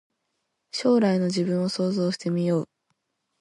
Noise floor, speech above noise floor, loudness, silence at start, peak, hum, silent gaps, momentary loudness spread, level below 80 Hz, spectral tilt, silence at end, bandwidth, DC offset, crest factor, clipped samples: -78 dBFS; 54 dB; -24 LUFS; 0.75 s; -10 dBFS; none; none; 7 LU; -70 dBFS; -6.5 dB/octave; 0.75 s; 11.5 kHz; under 0.1%; 16 dB; under 0.1%